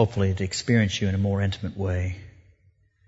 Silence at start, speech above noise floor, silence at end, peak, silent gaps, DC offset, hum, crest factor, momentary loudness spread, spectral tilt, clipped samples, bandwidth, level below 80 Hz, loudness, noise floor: 0 s; 38 dB; 0.8 s; -6 dBFS; none; under 0.1%; none; 20 dB; 8 LU; -6 dB/octave; under 0.1%; 8 kHz; -48 dBFS; -25 LUFS; -62 dBFS